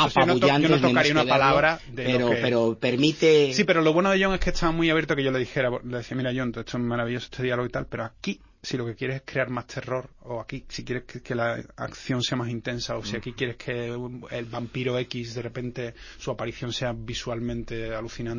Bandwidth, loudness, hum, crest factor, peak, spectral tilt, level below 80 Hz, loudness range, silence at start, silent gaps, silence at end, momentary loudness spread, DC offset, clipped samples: 7.4 kHz; -25 LUFS; none; 20 dB; -4 dBFS; -5.5 dB/octave; -46 dBFS; 11 LU; 0 s; none; 0 s; 14 LU; under 0.1%; under 0.1%